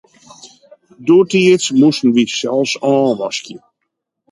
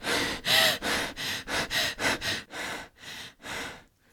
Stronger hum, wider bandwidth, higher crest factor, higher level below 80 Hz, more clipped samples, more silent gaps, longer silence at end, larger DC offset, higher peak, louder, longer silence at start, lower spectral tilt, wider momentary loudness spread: neither; second, 11.5 kHz vs over 20 kHz; second, 14 dB vs 22 dB; second, -62 dBFS vs -54 dBFS; neither; neither; first, 0.75 s vs 0.3 s; neither; first, 0 dBFS vs -8 dBFS; first, -14 LUFS vs -27 LUFS; first, 0.45 s vs 0 s; first, -4.5 dB/octave vs -1.5 dB/octave; second, 11 LU vs 19 LU